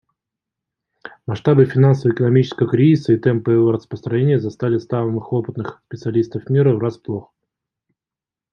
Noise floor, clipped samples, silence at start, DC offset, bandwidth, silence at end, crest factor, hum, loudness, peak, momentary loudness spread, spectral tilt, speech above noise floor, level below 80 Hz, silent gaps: -89 dBFS; under 0.1%; 1.05 s; under 0.1%; 6.8 kHz; 1.3 s; 16 dB; none; -17 LUFS; -2 dBFS; 14 LU; -9.5 dB/octave; 72 dB; -60 dBFS; none